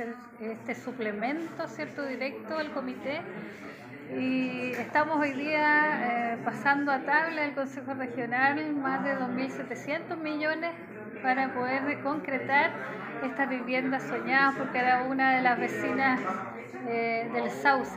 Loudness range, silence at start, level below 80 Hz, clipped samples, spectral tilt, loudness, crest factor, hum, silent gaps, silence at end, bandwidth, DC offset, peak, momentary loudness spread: 7 LU; 0 s; -76 dBFS; under 0.1%; -5.5 dB/octave; -29 LUFS; 20 dB; none; none; 0 s; 15.5 kHz; under 0.1%; -10 dBFS; 12 LU